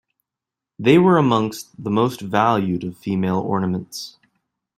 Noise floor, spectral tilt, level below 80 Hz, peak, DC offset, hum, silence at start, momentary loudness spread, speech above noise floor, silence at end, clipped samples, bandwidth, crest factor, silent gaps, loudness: -87 dBFS; -6.5 dB/octave; -58 dBFS; -2 dBFS; under 0.1%; none; 0.8 s; 14 LU; 68 dB; 0.65 s; under 0.1%; 15.5 kHz; 18 dB; none; -19 LUFS